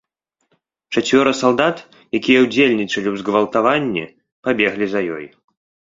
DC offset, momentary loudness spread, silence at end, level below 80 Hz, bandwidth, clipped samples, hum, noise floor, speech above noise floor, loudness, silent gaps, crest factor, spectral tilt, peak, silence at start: under 0.1%; 12 LU; 0.65 s; -58 dBFS; 7.8 kHz; under 0.1%; none; -71 dBFS; 54 dB; -17 LUFS; 4.32-4.43 s; 18 dB; -4.5 dB/octave; 0 dBFS; 0.9 s